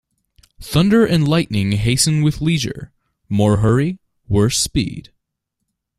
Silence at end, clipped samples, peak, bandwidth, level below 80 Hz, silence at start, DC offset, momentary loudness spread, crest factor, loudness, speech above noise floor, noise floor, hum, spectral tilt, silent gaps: 1 s; under 0.1%; 0 dBFS; 14 kHz; -38 dBFS; 0.6 s; under 0.1%; 11 LU; 16 dB; -17 LUFS; 61 dB; -77 dBFS; none; -5 dB/octave; none